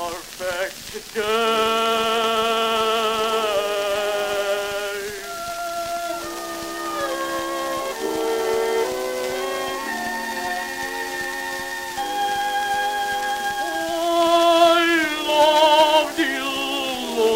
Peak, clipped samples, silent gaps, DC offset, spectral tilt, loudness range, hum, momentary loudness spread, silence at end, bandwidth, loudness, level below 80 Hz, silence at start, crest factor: -4 dBFS; under 0.1%; none; under 0.1%; -1.5 dB/octave; 9 LU; none; 12 LU; 0 s; 16 kHz; -21 LUFS; -54 dBFS; 0 s; 18 dB